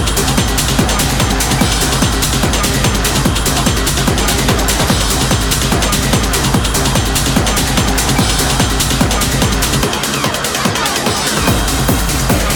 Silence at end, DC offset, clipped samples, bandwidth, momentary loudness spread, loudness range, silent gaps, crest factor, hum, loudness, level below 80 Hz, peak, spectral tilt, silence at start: 0 s; under 0.1%; under 0.1%; 19.5 kHz; 1 LU; 1 LU; none; 14 dB; none; -13 LUFS; -20 dBFS; 0 dBFS; -3.5 dB/octave; 0 s